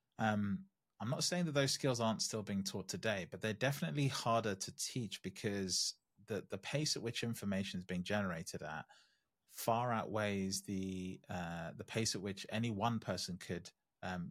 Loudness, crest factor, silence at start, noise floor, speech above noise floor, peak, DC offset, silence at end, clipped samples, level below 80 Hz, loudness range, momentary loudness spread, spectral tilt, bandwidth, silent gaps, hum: -39 LUFS; 20 dB; 0.2 s; -69 dBFS; 30 dB; -20 dBFS; under 0.1%; 0 s; under 0.1%; -76 dBFS; 3 LU; 10 LU; -4 dB/octave; 16 kHz; none; none